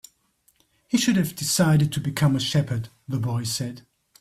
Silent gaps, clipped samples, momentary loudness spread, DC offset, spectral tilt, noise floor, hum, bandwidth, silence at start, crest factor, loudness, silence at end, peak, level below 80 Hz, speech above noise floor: none; under 0.1%; 10 LU; under 0.1%; -5 dB/octave; -65 dBFS; none; 15.5 kHz; 0.9 s; 16 dB; -23 LUFS; 0.4 s; -8 dBFS; -56 dBFS; 43 dB